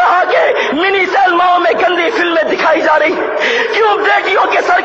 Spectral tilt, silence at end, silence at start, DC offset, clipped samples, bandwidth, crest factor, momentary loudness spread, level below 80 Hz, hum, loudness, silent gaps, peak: -3 dB/octave; 0 s; 0 s; under 0.1%; under 0.1%; 8 kHz; 10 dB; 3 LU; -54 dBFS; none; -11 LUFS; none; 0 dBFS